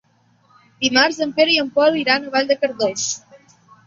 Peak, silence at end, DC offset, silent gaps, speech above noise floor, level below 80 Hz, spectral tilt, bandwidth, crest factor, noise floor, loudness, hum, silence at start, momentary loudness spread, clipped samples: 0 dBFS; 0.7 s; under 0.1%; none; 40 dB; -64 dBFS; -2 dB/octave; 7.8 kHz; 18 dB; -58 dBFS; -17 LUFS; none; 0.8 s; 7 LU; under 0.1%